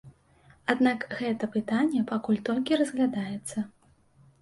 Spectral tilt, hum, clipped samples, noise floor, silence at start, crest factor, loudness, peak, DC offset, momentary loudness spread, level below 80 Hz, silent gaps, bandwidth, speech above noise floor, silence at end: -5.5 dB/octave; none; under 0.1%; -61 dBFS; 0.05 s; 22 dB; -28 LUFS; -6 dBFS; under 0.1%; 9 LU; -66 dBFS; none; 11.5 kHz; 34 dB; 0.7 s